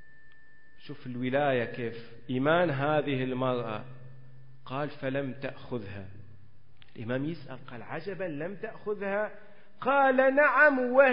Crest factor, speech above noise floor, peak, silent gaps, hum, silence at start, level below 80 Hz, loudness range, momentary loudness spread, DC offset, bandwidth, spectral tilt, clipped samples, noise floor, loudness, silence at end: 20 dB; 30 dB; -10 dBFS; none; none; 0.25 s; -66 dBFS; 12 LU; 21 LU; 0.7%; 5.4 kHz; -10 dB/octave; under 0.1%; -59 dBFS; -29 LUFS; 0 s